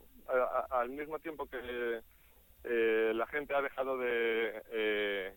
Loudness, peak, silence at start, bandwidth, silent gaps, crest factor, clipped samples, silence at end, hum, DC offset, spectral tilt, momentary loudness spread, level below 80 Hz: -35 LUFS; -20 dBFS; 0.15 s; 17.5 kHz; none; 14 dB; under 0.1%; 0 s; none; under 0.1%; -5 dB/octave; 10 LU; -64 dBFS